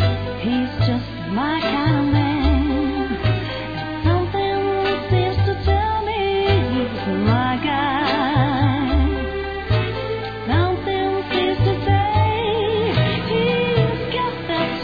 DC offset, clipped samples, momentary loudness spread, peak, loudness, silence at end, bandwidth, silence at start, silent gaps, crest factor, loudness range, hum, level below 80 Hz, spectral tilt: 0.4%; under 0.1%; 5 LU; -4 dBFS; -20 LUFS; 0 s; 5 kHz; 0 s; none; 14 dB; 1 LU; none; -30 dBFS; -8.5 dB/octave